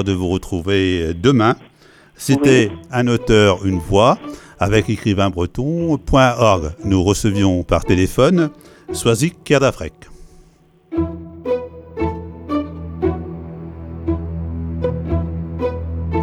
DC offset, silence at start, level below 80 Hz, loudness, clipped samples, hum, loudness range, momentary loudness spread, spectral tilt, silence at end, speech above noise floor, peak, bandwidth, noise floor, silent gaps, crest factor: under 0.1%; 0 s; -34 dBFS; -17 LUFS; under 0.1%; none; 9 LU; 14 LU; -6 dB/octave; 0 s; 35 dB; 0 dBFS; 16.5 kHz; -51 dBFS; none; 16 dB